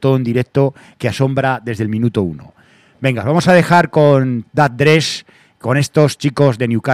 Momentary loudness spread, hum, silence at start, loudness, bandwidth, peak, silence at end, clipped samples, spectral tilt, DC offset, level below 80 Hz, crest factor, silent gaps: 9 LU; none; 0 s; -14 LUFS; 14.5 kHz; 0 dBFS; 0 s; 0.2%; -6.5 dB/octave; under 0.1%; -52 dBFS; 14 dB; none